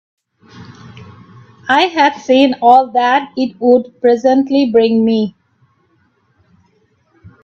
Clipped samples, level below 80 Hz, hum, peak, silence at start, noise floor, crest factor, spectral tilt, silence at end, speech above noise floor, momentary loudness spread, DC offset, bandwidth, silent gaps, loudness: under 0.1%; -60 dBFS; none; 0 dBFS; 0.55 s; -58 dBFS; 14 dB; -5.5 dB/octave; 2.15 s; 46 dB; 6 LU; under 0.1%; 7.2 kHz; none; -12 LUFS